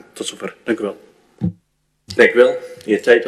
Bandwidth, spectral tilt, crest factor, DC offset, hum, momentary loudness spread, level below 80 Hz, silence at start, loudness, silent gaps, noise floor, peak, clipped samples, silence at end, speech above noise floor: 12.5 kHz; -5 dB/octave; 18 dB; under 0.1%; none; 16 LU; -56 dBFS; 0.15 s; -18 LUFS; none; -65 dBFS; 0 dBFS; under 0.1%; 0 s; 49 dB